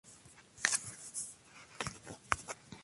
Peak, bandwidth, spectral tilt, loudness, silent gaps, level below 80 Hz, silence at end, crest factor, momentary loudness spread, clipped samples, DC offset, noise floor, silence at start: -8 dBFS; 12 kHz; -1 dB/octave; -38 LUFS; none; -62 dBFS; 0 s; 34 dB; 23 LU; under 0.1%; under 0.1%; -59 dBFS; 0.05 s